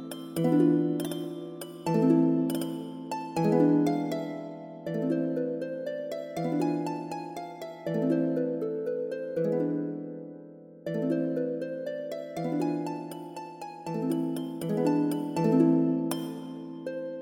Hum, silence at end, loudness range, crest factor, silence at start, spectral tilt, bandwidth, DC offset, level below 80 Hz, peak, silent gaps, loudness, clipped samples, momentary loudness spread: none; 0 s; 5 LU; 18 dB; 0 s; -7.5 dB/octave; 17 kHz; under 0.1%; -74 dBFS; -10 dBFS; none; -29 LUFS; under 0.1%; 16 LU